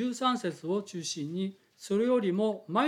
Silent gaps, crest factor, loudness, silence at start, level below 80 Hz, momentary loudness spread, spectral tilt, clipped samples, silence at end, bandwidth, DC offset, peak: none; 16 dB; -31 LUFS; 0 s; -84 dBFS; 9 LU; -5 dB/octave; under 0.1%; 0 s; 14.5 kHz; under 0.1%; -14 dBFS